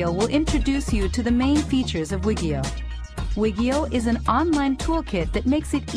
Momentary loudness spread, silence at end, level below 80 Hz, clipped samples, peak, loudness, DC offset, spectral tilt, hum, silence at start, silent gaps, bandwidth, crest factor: 6 LU; 0 s; -30 dBFS; under 0.1%; -6 dBFS; -23 LUFS; under 0.1%; -6 dB/octave; none; 0 s; none; 13.5 kHz; 16 dB